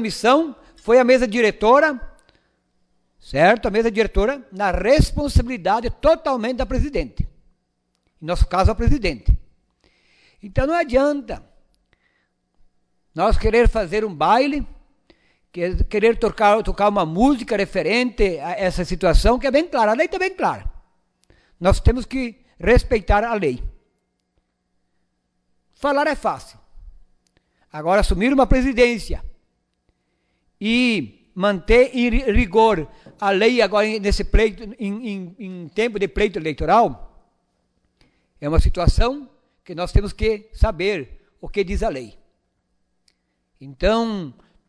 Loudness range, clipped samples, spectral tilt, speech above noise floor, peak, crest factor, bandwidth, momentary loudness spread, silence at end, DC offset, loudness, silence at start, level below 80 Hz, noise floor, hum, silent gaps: 7 LU; under 0.1%; -6 dB/octave; 53 dB; -4 dBFS; 16 dB; 11 kHz; 14 LU; 0.4 s; under 0.1%; -19 LUFS; 0 s; -28 dBFS; -71 dBFS; none; none